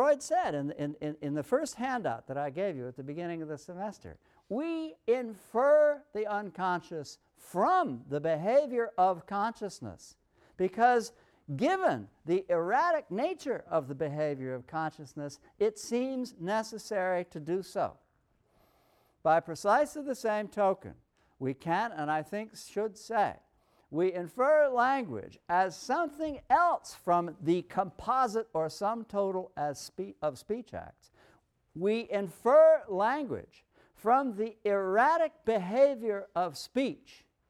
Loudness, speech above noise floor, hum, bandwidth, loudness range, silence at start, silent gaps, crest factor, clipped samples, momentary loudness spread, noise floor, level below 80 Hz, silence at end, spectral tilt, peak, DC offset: -31 LUFS; 41 dB; none; 14 kHz; 6 LU; 0 s; none; 18 dB; under 0.1%; 13 LU; -72 dBFS; -68 dBFS; 0.55 s; -5.5 dB/octave; -12 dBFS; under 0.1%